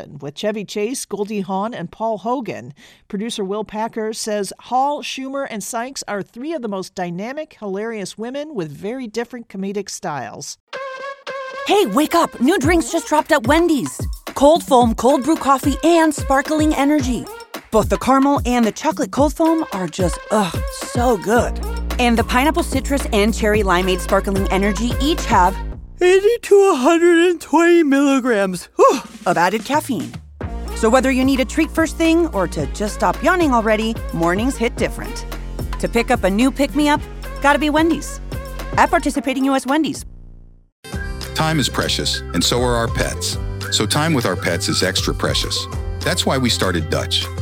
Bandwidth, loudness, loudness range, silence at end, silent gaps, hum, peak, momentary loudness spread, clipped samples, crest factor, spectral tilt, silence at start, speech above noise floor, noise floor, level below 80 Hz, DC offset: 17 kHz; -18 LUFS; 9 LU; 0 s; 10.60-10.67 s, 40.72-40.83 s; none; 0 dBFS; 13 LU; under 0.1%; 18 dB; -4.5 dB/octave; 0 s; 23 dB; -40 dBFS; -32 dBFS; under 0.1%